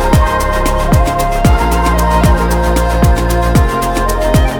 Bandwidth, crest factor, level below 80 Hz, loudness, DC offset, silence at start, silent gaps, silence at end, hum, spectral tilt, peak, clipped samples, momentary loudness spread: 18.5 kHz; 10 dB; -14 dBFS; -12 LUFS; under 0.1%; 0 s; none; 0 s; none; -6 dB/octave; 0 dBFS; under 0.1%; 3 LU